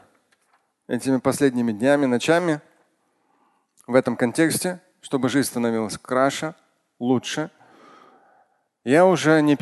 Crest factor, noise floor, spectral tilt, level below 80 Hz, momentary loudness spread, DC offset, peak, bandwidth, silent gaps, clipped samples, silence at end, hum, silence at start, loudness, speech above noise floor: 18 dB; -67 dBFS; -5 dB/octave; -64 dBFS; 12 LU; under 0.1%; -4 dBFS; 12.5 kHz; none; under 0.1%; 0.05 s; none; 0.9 s; -21 LUFS; 47 dB